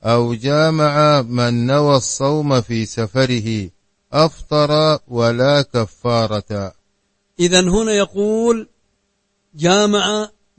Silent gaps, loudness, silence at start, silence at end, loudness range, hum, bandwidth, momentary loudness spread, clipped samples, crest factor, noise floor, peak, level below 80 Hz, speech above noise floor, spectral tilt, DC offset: none; -16 LUFS; 0.05 s; 0.3 s; 2 LU; none; 8.8 kHz; 8 LU; under 0.1%; 16 dB; -67 dBFS; 0 dBFS; -42 dBFS; 51 dB; -5 dB/octave; under 0.1%